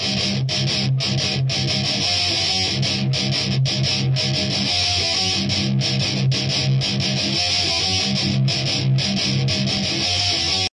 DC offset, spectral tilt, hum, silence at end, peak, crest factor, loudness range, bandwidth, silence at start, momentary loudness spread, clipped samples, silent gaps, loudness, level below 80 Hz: under 0.1%; -3.5 dB/octave; none; 0.1 s; -8 dBFS; 12 dB; 0 LU; 11 kHz; 0 s; 2 LU; under 0.1%; none; -19 LUFS; -50 dBFS